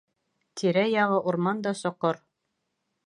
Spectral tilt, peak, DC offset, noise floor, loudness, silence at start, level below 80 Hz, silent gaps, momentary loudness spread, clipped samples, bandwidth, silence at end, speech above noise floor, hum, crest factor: -6 dB/octave; -10 dBFS; under 0.1%; -79 dBFS; -26 LUFS; 0.55 s; -76 dBFS; none; 8 LU; under 0.1%; 11.5 kHz; 0.9 s; 54 dB; none; 18 dB